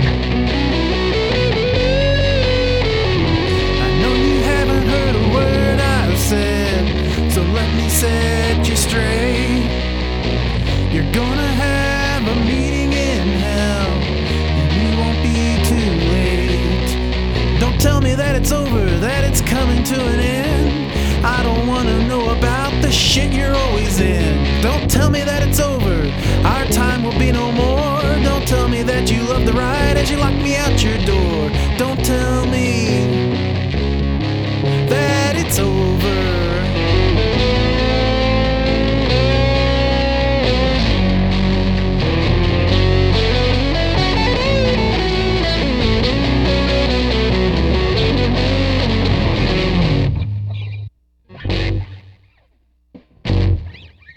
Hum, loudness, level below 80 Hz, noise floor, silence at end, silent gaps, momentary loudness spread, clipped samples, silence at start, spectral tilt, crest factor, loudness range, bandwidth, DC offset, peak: none; -16 LUFS; -20 dBFS; -58 dBFS; 0.3 s; none; 3 LU; under 0.1%; 0 s; -5.5 dB/octave; 16 dB; 2 LU; 19 kHz; under 0.1%; 0 dBFS